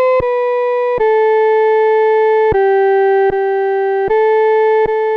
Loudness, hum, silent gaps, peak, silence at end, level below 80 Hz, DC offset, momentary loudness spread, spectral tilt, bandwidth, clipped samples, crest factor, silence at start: -13 LUFS; none; none; -6 dBFS; 0 s; -42 dBFS; under 0.1%; 3 LU; -7 dB/octave; 5.2 kHz; under 0.1%; 6 dB; 0 s